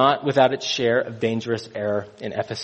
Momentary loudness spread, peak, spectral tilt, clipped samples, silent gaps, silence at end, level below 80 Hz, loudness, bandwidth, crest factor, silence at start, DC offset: 9 LU; -4 dBFS; -5 dB/octave; under 0.1%; none; 0 s; -62 dBFS; -23 LUFS; 8.4 kHz; 18 dB; 0 s; under 0.1%